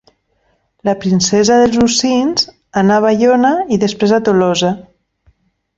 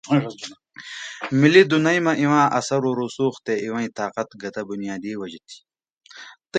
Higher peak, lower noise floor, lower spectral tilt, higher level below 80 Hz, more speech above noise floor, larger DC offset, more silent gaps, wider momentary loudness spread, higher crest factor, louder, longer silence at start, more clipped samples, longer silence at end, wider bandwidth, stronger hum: about the same, -2 dBFS vs 0 dBFS; first, -61 dBFS vs -44 dBFS; about the same, -4.5 dB/octave vs -5.5 dB/octave; first, -48 dBFS vs -68 dBFS; first, 49 dB vs 24 dB; neither; second, none vs 5.92-5.97 s; second, 8 LU vs 22 LU; second, 12 dB vs 22 dB; first, -13 LUFS vs -21 LUFS; first, 0.85 s vs 0.05 s; neither; first, 0.95 s vs 0 s; second, 8 kHz vs 9.2 kHz; neither